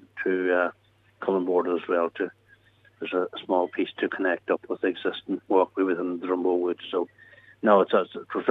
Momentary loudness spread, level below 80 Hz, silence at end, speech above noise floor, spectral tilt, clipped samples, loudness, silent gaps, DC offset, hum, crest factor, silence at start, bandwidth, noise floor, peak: 9 LU; -78 dBFS; 0 s; 33 dB; -7.5 dB/octave; under 0.1%; -26 LUFS; none; under 0.1%; none; 20 dB; 0.15 s; 4.5 kHz; -58 dBFS; -6 dBFS